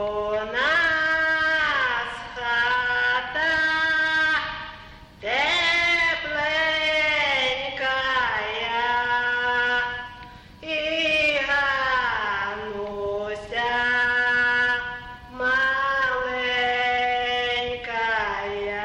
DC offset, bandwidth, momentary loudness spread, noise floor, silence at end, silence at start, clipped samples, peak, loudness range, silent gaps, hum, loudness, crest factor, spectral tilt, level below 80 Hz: under 0.1%; 10.5 kHz; 10 LU; -44 dBFS; 0 s; 0 s; under 0.1%; -10 dBFS; 2 LU; none; none; -22 LUFS; 12 dB; -2.5 dB/octave; -50 dBFS